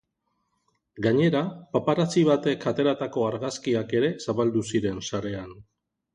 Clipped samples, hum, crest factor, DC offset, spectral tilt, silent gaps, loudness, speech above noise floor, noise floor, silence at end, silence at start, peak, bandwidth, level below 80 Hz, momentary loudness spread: under 0.1%; none; 16 dB; under 0.1%; -6 dB/octave; none; -25 LUFS; 51 dB; -76 dBFS; 0.55 s; 0.95 s; -10 dBFS; 11 kHz; -60 dBFS; 9 LU